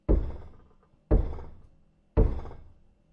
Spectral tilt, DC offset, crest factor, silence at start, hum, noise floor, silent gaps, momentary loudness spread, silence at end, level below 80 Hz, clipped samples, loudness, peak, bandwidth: -11.5 dB/octave; under 0.1%; 20 dB; 0.1 s; none; -60 dBFS; none; 20 LU; 0.5 s; -30 dBFS; under 0.1%; -30 LUFS; -10 dBFS; 3.6 kHz